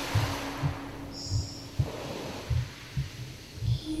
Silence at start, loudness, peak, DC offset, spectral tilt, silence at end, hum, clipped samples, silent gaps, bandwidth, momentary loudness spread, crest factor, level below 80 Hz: 0 s; -34 LUFS; -14 dBFS; under 0.1%; -5.5 dB/octave; 0 s; none; under 0.1%; none; 16 kHz; 8 LU; 18 dB; -44 dBFS